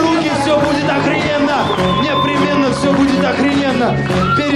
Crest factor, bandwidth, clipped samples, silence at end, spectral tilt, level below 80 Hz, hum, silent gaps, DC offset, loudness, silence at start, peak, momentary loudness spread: 12 dB; 12 kHz; under 0.1%; 0 s; -5.5 dB/octave; -38 dBFS; none; none; 0.3%; -14 LUFS; 0 s; -2 dBFS; 1 LU